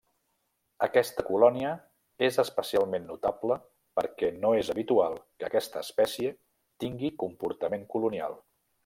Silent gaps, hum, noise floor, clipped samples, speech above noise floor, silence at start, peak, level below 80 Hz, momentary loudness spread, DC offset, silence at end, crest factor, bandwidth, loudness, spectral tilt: none; none; -77 dBFS; under 0.1%; 48 dB; 0.8 s; -8 dBFS; -66 dBFS; 9 LU; under 0.1%; 0.45 s; 22 dB; 16.5 kHz; -29 LUFS; -5 dB/octave